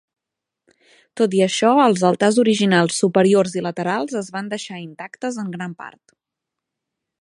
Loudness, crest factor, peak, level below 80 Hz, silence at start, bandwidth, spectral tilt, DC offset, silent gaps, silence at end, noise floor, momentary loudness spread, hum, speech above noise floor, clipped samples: -18 LUFS; 18 dB; -2 dBFS; -68 dBFS; 1.15 s; 11.5 kHz; -5 dB/octave; under 0.1%; none; 1.35 s; -84 dBFS; 17 LU; none; 66 dB; under 0.1%